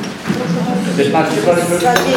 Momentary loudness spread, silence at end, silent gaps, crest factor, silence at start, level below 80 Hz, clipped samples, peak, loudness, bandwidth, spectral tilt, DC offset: 5 LU; 0 s; none; 14 dB; 0 s; -48 dBFS; under 0.1%; 0 dBFS; -15 LUFS; 19 kHz; -5 dB/octave; under 0.1%